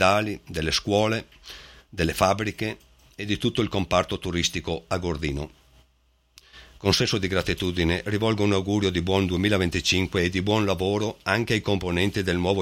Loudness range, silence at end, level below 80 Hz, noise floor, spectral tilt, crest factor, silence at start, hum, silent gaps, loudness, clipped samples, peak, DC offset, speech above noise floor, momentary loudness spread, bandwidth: 4 LU; 0 s; -44 dBFS; -64 dBFS; -5 dB/octave; 22 dB; 0 s; none; none; -24 LUFS; under 0.1%; -4 dBFS; under 0.1%; 40 dB; 9 LU; 16.5 kHz